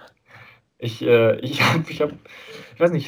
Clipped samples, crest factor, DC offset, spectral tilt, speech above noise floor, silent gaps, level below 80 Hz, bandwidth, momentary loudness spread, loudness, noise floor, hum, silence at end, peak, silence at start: under 0.1%; 18 dB; under 0.1%; -6 dB/octave; 28 dB; none; -62 dBFS; over 20 kHz; 23 LU; -20 LUFS; -49 dBFS; none; 0 s; -4 dBFS; 0.35 s